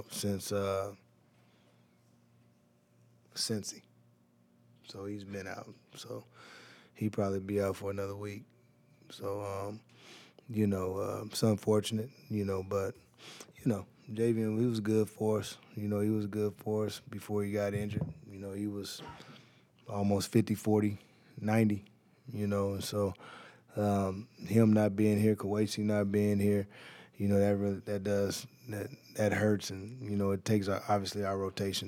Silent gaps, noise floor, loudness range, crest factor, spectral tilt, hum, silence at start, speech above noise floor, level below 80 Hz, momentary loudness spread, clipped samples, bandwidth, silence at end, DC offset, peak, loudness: none; -68 dBFS; 11 LU; 20 dB; -6 dB/octave; none; 0 s; 35 dB; -74 dBFS; 19 LU; under 0.1%; 16.5 kHz; 0 s; under 0.1%; -14 dBFS; -33 LUFS